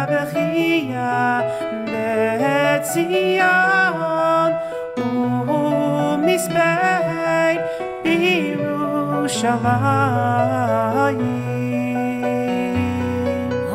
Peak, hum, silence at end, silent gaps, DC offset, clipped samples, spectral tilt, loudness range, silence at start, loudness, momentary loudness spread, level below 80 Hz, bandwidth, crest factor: -4 dBFS; none; 0 s; none; under 0.1%; under 0.1%; -5.5 dB/octave; 2 LU; 0 s; -19 LUFS; 6 LU; -54 dBFS; 16 kHz; 14 dB